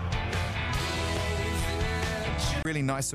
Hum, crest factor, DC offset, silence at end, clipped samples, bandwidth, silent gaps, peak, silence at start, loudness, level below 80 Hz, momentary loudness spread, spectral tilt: none; 12 dB; under 0.1%; 0 s; under 0.1%; 15.5 kHz; none; -18 dBFS; 0 s; -30 LUFS; -36 dBFS; 1 LU; -4.5 dB/octave